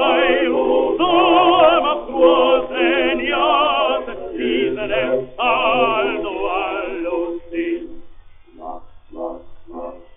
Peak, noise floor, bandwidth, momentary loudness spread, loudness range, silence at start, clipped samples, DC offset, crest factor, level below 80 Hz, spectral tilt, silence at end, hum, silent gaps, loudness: -2 dBFS; -40 dBFS; 3.8 kHz; 20 LU; 11 LU; 0 s; under 0.1%; under 0.1%; 16 dB; -44 dBFS; -1 dB/octave; 0.15 s; none; none; -17 LUFS